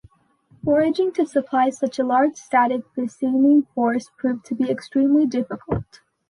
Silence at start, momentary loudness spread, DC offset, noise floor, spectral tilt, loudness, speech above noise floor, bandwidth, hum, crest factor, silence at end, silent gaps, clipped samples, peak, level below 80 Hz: 0.65 s; 9 LU; under 0.1%; -57 dBFS; -6.5 dB/octave; -21 LUFS; 37 dB; 11 kHz; none; 14 dB; 0.45 s; none; under 0.1%; -8 dBFS; -52 dBFS